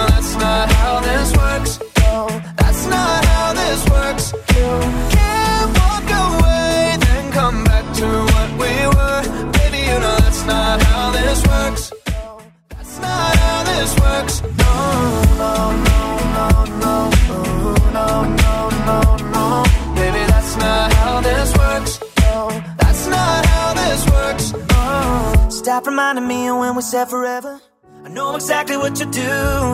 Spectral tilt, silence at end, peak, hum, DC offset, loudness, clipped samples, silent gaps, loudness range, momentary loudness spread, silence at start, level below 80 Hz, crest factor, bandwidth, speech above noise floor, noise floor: -5 dB/octave; 0 s; 0 dBFS; none; under 0.1%; -16 LUFS; under 0.1%; none; 2 LU; 6 LU; 0 s; -18 dBFS; 14 dB; 16 kHz; 24 dB; -43 dBFS